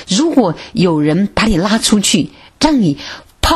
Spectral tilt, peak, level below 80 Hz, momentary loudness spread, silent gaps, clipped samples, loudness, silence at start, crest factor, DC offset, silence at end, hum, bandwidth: -4.5 dB/octave; 0 dBFS; -30 dBFS; 6 LU; none; under 0.1%; -13 LUFS; 0 s; 14 dB; under 0.1%; 0 s; none; 14 kHz